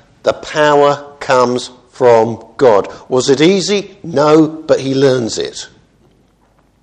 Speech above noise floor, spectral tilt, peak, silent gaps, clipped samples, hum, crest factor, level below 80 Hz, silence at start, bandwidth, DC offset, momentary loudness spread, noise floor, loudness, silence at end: 41 dB; -5 dB/octave; 0 dBFS; none; 0.2%; none; 14 dB; -52 dBFS; 0.25 s; 10 kHz; under 0.1%; 11 LU; -53 dBFS; -13 LUFS; 1.15 s